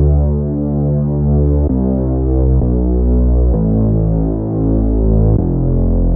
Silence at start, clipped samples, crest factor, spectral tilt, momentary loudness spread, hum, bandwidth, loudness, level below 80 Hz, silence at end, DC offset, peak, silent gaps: 0 s; under 0.1%; 10 dB; -16.5 dB/octave; 3 LU; none; 1.7 kHz; -15 LUFS; -16 dBFS; 0 s; under 0.1%; -2 dBFS; none